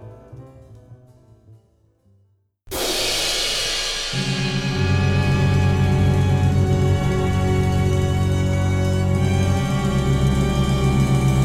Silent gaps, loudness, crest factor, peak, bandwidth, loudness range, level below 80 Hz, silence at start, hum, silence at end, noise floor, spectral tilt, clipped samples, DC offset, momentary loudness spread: none; -19 LUFS; 12 dB; -6 dBFS; 16 kHz; 5 LU; -30 dBFS; 0 s; none; 0 s; -61 dBFS; -5.5 dB/octave; under 0.1%; under 0.1%; 4 LU